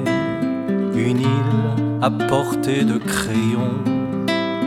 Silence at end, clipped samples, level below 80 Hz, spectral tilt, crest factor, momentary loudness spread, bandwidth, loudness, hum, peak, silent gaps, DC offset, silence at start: 0 s; under 0.1%; -50 dBFS; -6.5 dB/octave; 16 dB; 3 LU; 14 kHz; -20 LUFS; none; -4 dBFS; none; under 0.1%; 0 s